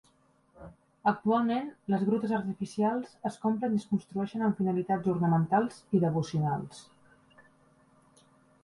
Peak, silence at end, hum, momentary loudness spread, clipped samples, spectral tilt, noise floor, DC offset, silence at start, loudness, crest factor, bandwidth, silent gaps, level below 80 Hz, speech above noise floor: -12 dBFS; 1.8 s; none; 7 LU; under 0.1%; -8 dB/octave; -67 dBFS; under 0.1%; 0.6 s; -30 LUFS; 18 dB; 11.5 kHz; none; -66 dBFS; 37 dB